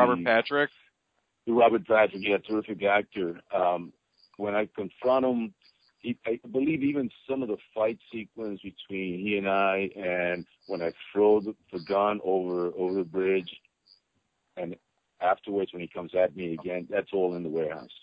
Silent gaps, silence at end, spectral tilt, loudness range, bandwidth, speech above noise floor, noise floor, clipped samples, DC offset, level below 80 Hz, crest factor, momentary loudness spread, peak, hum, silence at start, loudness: none; 0.1 s; -8.5 dB/octave; 5 LU; 5.2 kHz; 49 dB; -77 dBFS; under 0.1%; under 0.1%; -66 dBFS; 20 dB; 14 LU; -8 dBFS; none; 0 s; -28 LUFS